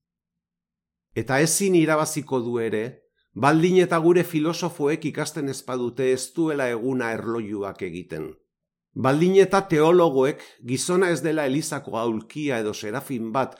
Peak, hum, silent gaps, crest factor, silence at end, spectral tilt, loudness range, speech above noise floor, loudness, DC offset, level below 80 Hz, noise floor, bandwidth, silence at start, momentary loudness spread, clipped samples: -4 dBFS; none; none; 18 dB; 0.05 s; -5 dB/octave; 6 LU; 66 dB; -23 LUFS; under 0.1%; -64 dBFS; -88 dBFS; 17 kHz; 1.15 s; 13 LU; under 0.1%